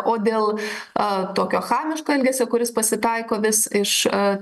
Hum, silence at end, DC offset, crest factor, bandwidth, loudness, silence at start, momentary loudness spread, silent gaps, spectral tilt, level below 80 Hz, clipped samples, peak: none; 0 s; under 0.1%; 16 dB; 13 kHz; -21 LUFS; 0 s; 4 LU; none; -3 dB/octave; -64 dBFS; under 0.1%; -4 dBFS